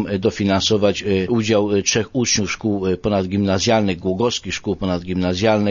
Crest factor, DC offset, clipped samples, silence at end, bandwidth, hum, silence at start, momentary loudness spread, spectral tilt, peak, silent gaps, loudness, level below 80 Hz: 16 dB; under 0.1%; under 0.1%; 0 s; 7.4 kHz; none; 0 s; 5 LU; -4.5 dB/octave; -2 dBFS; none; -19 LUFS; -44 dBFS